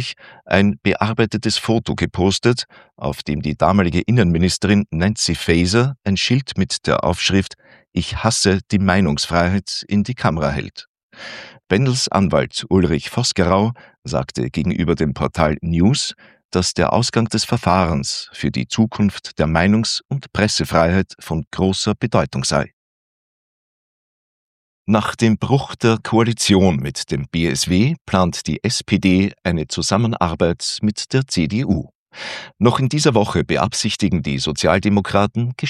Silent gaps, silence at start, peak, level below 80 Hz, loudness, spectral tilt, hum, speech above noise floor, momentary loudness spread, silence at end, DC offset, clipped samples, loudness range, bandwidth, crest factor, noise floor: 10.87-10.94 s, 11.03-11.10 s, 16.45-16.49 s, 20.05-20.09 s, 21.47-21.51 s, 22.73-24.85 s, 28.01-28.05 s, 31.95-32.06 s; 0 s; 0 dBFS; -42 dBFS; -18 LUFS; -5 dB/octave; none; over 72 dB; 8 LU; 0 s; under 0.1%; under 0.1%; 3 LU; 14 kHz; 18 dB; under -90 dBFS